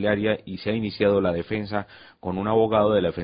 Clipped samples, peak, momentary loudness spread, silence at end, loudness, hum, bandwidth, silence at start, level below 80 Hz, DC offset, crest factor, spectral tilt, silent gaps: under 0.1%; -8 dBFS; 11 LU; 0 s; -24 LUFS; none; 5.2 kHz; 0 s; -48 dBFS; under 0.1%; 16 dB; -11 dB/octave; none